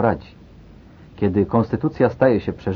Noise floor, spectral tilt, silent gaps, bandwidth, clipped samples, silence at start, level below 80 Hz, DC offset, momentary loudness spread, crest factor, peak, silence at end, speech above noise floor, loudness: -44 dBFS; -10 dB/octave; none; 6.4 kHz; under 0.1%; 0 s; -46 dBFS; under 0.1%; 6 LU; 18 dB; -2 dBFS; 0 s; 25 dB; -20 LUFS